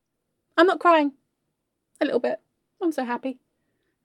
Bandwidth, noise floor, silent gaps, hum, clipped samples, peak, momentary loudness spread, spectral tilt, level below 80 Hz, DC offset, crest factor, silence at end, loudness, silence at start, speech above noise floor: 12.5 kHz; -78 dBFS; none; none; under 0.1%; -6 dBFS; 12 LU; -4 dB/octave; -86 dBFS; under 0.1%; 20 dB; 0.7 s; -23 LUFS; 0.55 s; 56 dB